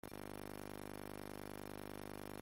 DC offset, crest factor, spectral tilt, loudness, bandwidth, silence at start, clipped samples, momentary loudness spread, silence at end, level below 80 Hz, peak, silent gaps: under 0.1%; 16 dB; -5 dB/octave; -50 LUFS; 17 kHz; 0.05 s; under 0.1%; 0 LU; 0 s; -64 dBFS; -34 dBFS; none